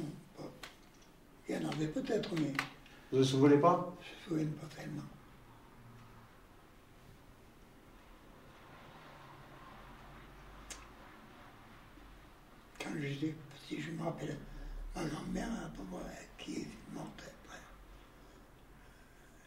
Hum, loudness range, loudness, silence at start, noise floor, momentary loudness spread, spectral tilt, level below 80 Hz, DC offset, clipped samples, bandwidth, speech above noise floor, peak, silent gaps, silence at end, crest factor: none; 24 LU; -37 LUFS; 0 s; -60 dBFS; 24 LU; -6 dB/octave; -58 dBFS; under 0.1%; under 0.1%; 16 kHz; 24 dB; -16 dBFS; none; 0.05 s; 24 dB